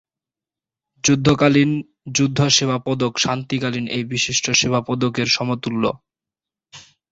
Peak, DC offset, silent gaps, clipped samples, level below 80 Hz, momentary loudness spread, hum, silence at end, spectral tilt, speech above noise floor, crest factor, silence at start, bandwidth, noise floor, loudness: -2 dBFS; under 0.1%; none; under 0.1%; -52 dBFS; 8 LU; none; 0.3 s; -4 dB/octave; 70 dB; 20 dB; 1.05 s; 8 kHz; -89 dBFS; -19 LUFS